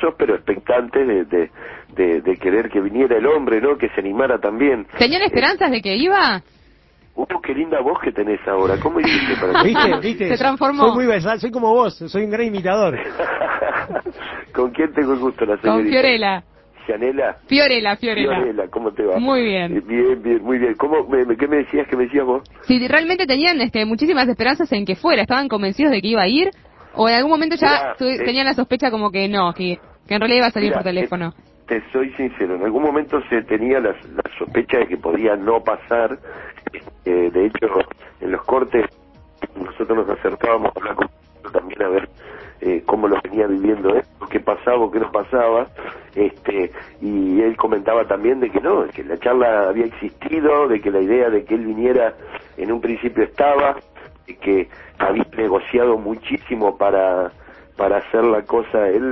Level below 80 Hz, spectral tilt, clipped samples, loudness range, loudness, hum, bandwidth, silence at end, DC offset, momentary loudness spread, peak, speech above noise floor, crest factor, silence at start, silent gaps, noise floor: -48 dBFS; -6.5 dB/octave; under 0.1%; 4 LU; -18 LUFS; none; 6 kHz; 0 s; under 0.1%; 10 LU; 0 dBFS; 34 dB; 18 dB; 0 s; none; -51 dBFS